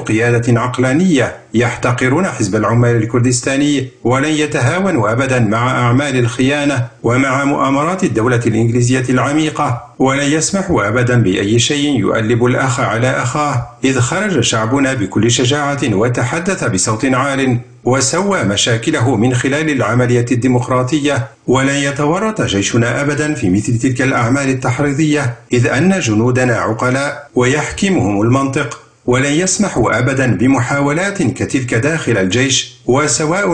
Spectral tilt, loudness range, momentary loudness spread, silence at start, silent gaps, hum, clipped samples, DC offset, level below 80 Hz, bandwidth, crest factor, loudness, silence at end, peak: -5 dB/octave; 1 LU; 4 LU; 0 s; none; none; under 0.1%; 0.2%; -42 dBFS; 10 kHz; 12 dB; -14 LUFS; 0 s; -2 dBFS